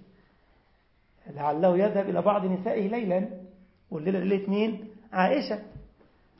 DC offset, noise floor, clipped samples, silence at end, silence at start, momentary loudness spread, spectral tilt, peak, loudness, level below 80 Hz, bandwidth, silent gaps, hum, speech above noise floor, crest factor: under 0.1%; -65 dBFS; under 0.1%; 0.55 s; 1.25 s; 14 LU; -11 dB/octave; -8 dBFS; -27 LUFS; -62 dBFS; 5.8 kHz; none; none; 39 dB; 20 dB